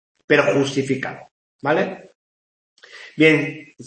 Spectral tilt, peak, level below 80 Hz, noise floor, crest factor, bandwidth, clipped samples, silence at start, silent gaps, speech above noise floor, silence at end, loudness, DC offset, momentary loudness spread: -5.5 dB/octave; -2 dBFS; -66 dBFS; under -90 dBFS; 20 dB; 8.8 kHz; under 0.1%; 0.3 s; 1.31-1.59 s, 2.15-2.76 s; over 71 dB; 0 s; -19 LUFS; under 0.1%; 23 LU